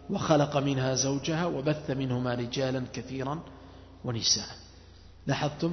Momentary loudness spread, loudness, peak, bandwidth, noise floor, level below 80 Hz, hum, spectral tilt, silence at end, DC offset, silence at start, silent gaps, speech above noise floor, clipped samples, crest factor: 15 LU; -29 LUFS; -10 dBFS; 6.4 kHz; -51 dBFS; -56 dBFS; none; -4.5 dB/octave; 0 s; under 0.1%; 0 s; none; 22 dB; under 0.1%; 20 dB